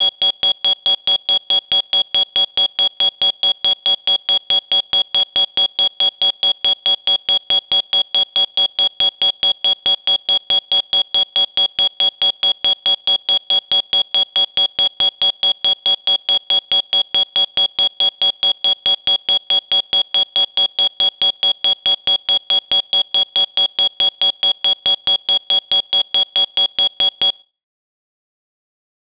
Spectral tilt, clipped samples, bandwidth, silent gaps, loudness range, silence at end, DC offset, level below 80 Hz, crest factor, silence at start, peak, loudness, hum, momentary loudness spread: -5.5 dB/octave; under 0.1%; 4 kHz; none; 0 LU; 1.8 s; under 0.1%; -56 dBFS; 14 dB; 0 s; -4 dBFS; -13 LUFS; none; 1 LU